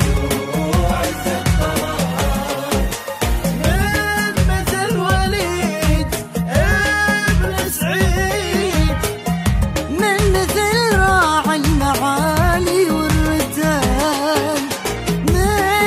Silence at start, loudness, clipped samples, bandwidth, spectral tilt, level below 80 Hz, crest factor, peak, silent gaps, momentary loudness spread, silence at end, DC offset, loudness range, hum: 0 s; -17 LUFS; under 0.1%; 16 kHz; -4.5 dB/octave; -24 dBFS; 14 dB; -2 dBFS; none; 5 LU; 0 s; under 0.1%; 3 LU; none